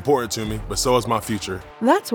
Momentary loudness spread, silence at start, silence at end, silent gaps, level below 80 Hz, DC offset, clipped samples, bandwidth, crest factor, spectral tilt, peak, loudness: 7 LU; 0 s; 0 s; none; -40 dBFS; under 0.1%; under 0.1%; 19 kHz; 18 dB; -4.5 dB/octave; -4 dBFS; -22 LUFS